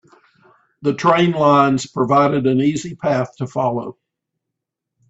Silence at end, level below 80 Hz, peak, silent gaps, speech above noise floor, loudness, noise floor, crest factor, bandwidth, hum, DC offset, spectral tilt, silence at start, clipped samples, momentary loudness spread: 1.2 s; -58 dBFS; -2 dBFS; none; 65 dB; -17 LUFS; -81 dBFS; 18 dB; 8 kHz; none; under 0.1%; -6.5 dB/octave; 0.8 s; under 0.1%; 10 LU